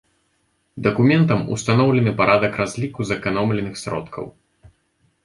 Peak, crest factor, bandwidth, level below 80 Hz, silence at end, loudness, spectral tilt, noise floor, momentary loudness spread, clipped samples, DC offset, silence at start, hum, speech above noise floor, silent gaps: -2 dBFS; 18 dB; 11.5 kHz; -50 dBFS; 0.95 s; -19 LUFS; -6.5 dB/octave; -67 dBFS; 12 LU; under 0.1%; under 0.1%; 0.75 s; none; 48 dB; none